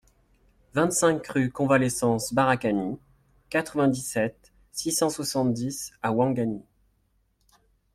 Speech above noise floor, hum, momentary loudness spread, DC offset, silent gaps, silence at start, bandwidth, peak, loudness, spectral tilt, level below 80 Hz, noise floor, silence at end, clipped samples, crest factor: 44 dB; none; 9 LU; under 0.1%; none; 0.75 s; 16 kHz; -8 dBFS; -26 LUFS; -4.5 dB/octave; -58 dBFS; -69 dBFS; 1.35 s; under 0.1%; 20 dB